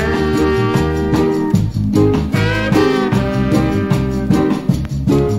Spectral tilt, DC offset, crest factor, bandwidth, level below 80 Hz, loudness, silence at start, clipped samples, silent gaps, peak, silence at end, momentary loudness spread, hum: -7 dB/octave; under 0.1%; 12 dB; 15.5 kHz; -28 dBFS; -15 LUFS; 0 s; under 0.1%; none; -2 dBFS; 0 s; 3 LU; none